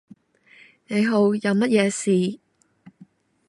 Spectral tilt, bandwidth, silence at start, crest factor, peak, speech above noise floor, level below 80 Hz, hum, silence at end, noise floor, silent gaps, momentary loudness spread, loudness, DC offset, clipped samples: -5.5 dB/octave; 11.5 kHz; 0.9 s; 18 dB; -6 dBFS; 34 dB; -72 dBFS; none; 1.15 s; -54 dBFS; none; 9 LU; -21 LUFS; under 0.1%; under 0.1%